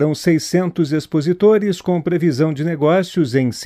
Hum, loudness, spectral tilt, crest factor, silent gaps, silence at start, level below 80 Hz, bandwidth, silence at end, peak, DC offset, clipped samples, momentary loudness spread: none; -17 LUFS; -6.5 dB/octave; 12 dB; none; 0 s; -56 dBFS; 15 kHz; 0 s; -4 dBFS; under 0.1%; under 0.1%; 5 LU